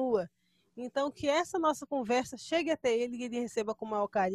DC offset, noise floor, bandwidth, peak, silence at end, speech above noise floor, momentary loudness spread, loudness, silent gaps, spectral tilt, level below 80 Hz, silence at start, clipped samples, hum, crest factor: under 0.1%; -66 dBFS; 13.5 kHz; -18 dBFS; 0 s; 34 dB; 6 LU; -32 LUFS; none; -4 dB/octave; -68 dBFS; 0 s; under 0.1%; none; 14 dB